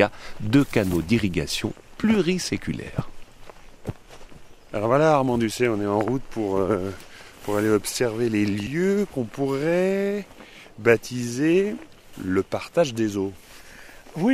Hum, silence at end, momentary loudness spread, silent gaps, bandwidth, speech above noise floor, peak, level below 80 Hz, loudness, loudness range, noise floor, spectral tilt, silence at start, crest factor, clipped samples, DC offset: none; 0 s; 17 LU; none; 16 kHz; 21 dB; -2 dBFS; -46 dBFS; -24 LUFS; 2 LU; -44 dBFS; -5.5 dB/octave; 0 s; 22 dB; under 0.1%; under 0.1%